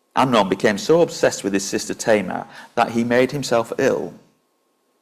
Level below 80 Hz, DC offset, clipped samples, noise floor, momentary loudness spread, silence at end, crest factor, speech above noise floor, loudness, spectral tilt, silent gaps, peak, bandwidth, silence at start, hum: -56 dBFS; under 0.1%; under 0.1%; -66 dBFS; 9 LU; 0.85 s; 16 dB; 47 dB; -19 LUFS; -4.5 dB/octave; none; -4 dBFS; 15.5 kHz; 0.15 s; none